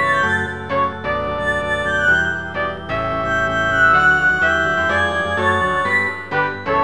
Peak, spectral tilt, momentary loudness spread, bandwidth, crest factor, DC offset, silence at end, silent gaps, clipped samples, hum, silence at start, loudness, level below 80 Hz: -4 dBFS; -5 dB/octave; 9 LU; 11 kHz; 14 dB; 0.7%; 0 s; none; under 0.1%; none; 0 s; -17 LUFS; -40 dBFS